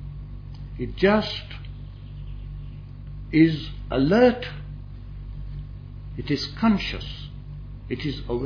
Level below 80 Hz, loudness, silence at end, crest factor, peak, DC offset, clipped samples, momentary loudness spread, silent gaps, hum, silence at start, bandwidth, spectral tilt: -38 dBFS; -23 LUFS; 0 s; 20 dB; -6 dBFS; under 0.1%; under 0.1%; 20 LU; none; none; 0 s; 5.4 kHz; -7.5 dB/octave